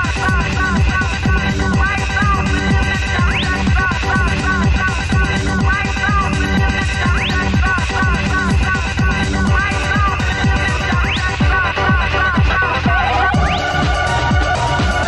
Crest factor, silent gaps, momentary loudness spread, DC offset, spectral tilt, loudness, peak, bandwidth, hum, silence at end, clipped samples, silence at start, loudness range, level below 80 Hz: 12 dB; none; 2 LU; under 0.1%; -5 dB/octave; -15 LUFS; -2 dBFS; 11.5 kHz; none; 0 s; under 0.1%; 0 s; 1 LU; -20 dBFS